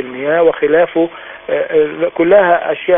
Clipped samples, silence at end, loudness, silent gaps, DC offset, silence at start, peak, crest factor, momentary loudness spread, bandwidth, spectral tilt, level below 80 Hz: under 0.1%; 0 s; -13 LUFS; none; under 0.1%; 0 s; 0 dBFS; 12 dB; 9 LU; 3.7 kHz; -9.5 dB/octave; -56 dBFS